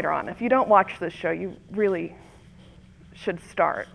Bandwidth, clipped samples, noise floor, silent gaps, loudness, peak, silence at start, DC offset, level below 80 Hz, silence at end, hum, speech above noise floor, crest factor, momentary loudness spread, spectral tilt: 11 kHz; under 0.1%; -50 dBFS; none; -25 LUFS; -4 dBFS; 0 s; under 0.1%; -56 dBFS; 0.1 s; none; 25 dB; 22 dB; 13 LU; -6.5 dB/octave